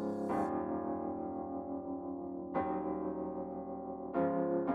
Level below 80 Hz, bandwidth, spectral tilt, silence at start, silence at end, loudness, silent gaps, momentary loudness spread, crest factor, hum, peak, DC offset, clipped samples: -64 dBFS; 9.8 kHz; -9.5 dB/octave; 0 s; 0 s; -38 LUFS; none; 8 LU; 16 dB; none; -22 dBFS; under 0.1%; under 0.1%